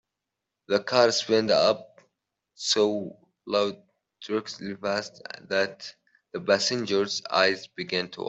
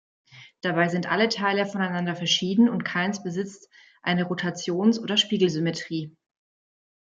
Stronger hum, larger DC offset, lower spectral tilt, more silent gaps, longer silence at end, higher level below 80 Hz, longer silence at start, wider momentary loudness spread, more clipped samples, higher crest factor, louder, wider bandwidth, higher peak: neither; neither; second, -3 dB/octave vs -4.5 dB/octave; neither; second, 0 s vs 1.1 s; about the same, -72 dBFS vs -72 dBFS; first, 0.7 s vs 0.35 s; first, 16 LU vs 11 LU; neither; about the same, 22 dB vs 20 dB; about the same, -26 LUFS vs -24 LUFS; about the same, 8.2 kHz vs 7.8 kHz; about the same, -6 dBFS vs -6 dBFS